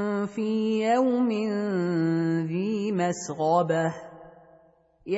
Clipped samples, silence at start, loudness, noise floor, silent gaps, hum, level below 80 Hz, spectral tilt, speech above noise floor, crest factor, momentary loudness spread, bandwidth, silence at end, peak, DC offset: under 0.1%; 0 s; -26 LUFS; -60 dBFS; none; none; -68 dBFS; -6.5 dB/octave; 35 dB; 16 dB; 6 LU; 8 kHz; 0 s; -10 dBFS; under 0.1%